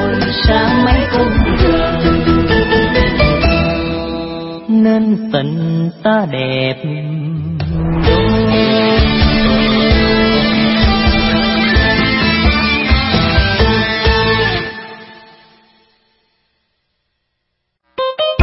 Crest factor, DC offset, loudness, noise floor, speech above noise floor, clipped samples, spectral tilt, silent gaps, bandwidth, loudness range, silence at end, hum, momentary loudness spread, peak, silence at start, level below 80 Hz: 14 dB; under 0.1%; -13 LUFS; -71 dBFS; 56 dB; under 0.1%; -9.5 dB/octave; none; 5.8 kHz; 5 LU; 0 s; none; 9 LU; 0 dBFS; 0 s; -22 dBFS